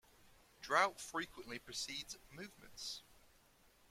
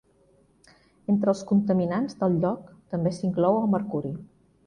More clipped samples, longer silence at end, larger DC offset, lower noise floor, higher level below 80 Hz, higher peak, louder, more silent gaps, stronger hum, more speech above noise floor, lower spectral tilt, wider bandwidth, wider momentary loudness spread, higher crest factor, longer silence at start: neither; first, 0.7 s vs 0.4 s; neither; first, -70 dBFS vs -62 dBFS; second, -72 dBFS vs -60 dBFS; second, -18 dBFS vs -10 dBFS; second, -41 LUFS vs -26 LUFS; neither; neither; second, 27 dB vs 37 dB; second, -1.5 dB/octave vs -8.5 dB/octave; first, 16.5 kHz vs 9.8 kHz; first, 19 LU vs 12 LU; first, 26 dB vs 16 dB; second, 0.6 s vs 1.1 s